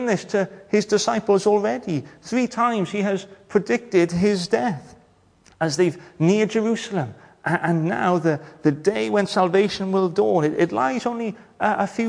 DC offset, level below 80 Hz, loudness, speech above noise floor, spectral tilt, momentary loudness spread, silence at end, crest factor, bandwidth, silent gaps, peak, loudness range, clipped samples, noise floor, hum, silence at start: under 0.1%; -60 dBFS; -22 LUFS; 35 dB; -5.5 dB/octave; 8 LU; 0 s; 16 dB; 10.5 kHz; none; -6 dBFS; 2 LU; under 0.1%; -56 dBFS; none; 0 s